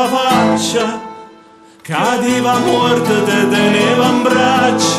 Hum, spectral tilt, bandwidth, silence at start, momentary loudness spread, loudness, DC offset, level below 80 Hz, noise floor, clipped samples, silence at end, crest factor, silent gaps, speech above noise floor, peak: none; -4 dB/octave; 15.5 kHz; 0 s; 6 LU; -13 LUFS; under 0.1%; -54 dBFS; -42 dBFS; under 0.1%; 0 s; 12 dB; none; 30 dB; 0 dBFS